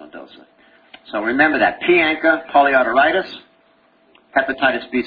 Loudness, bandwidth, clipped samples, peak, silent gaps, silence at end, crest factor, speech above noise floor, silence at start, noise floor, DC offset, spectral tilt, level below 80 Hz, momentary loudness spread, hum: -16 LUFS; 5 kHz; under 0.1%; 0 dBFS; none; 0 s; 18 dB; 40 dB; 0 s; -56 dBFS; under 0.1%; -7 dB/octave; -54 dBFS; 13 LU; none